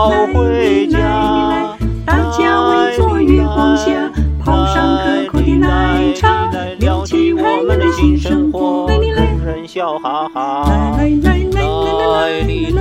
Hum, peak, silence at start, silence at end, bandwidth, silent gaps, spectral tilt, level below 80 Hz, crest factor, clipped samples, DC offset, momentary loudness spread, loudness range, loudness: none; 0 dBFS; 0 s; 0 s; 10 kHz; none; -7 dB/octave; -20 dBFS; 12 dB; under 0.1%; under 0.1%; 6 LU; 2 LU; -14 LUFS